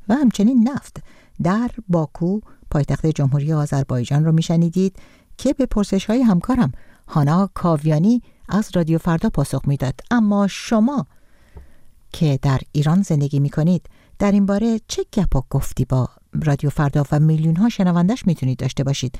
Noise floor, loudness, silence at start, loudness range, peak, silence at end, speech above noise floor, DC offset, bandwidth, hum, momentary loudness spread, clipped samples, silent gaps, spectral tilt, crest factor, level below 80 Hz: -43 dBFS; -19 LUFS; 0.05 s; 2 LU; -6 dBFS; 0 s; 25 dB; under 0.1%; 14 kHz; none; 7 LU; under 0.1%; none; -7.5 dB/octave; 12 dB; -36 dBFS